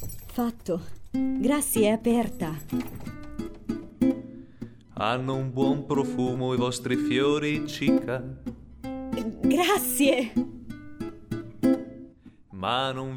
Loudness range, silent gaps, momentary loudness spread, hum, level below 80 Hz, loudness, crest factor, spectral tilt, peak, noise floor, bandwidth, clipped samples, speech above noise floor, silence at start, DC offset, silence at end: 4 LU; none; 17 LU; none; -50 dBFS; -27 LUFS; 18 dB; -5 dB/octave; -8 dBFS; -50 dBFS; 19 kHz; under 0.1%; 24 dB; 0 s; under 0.1%; 0 s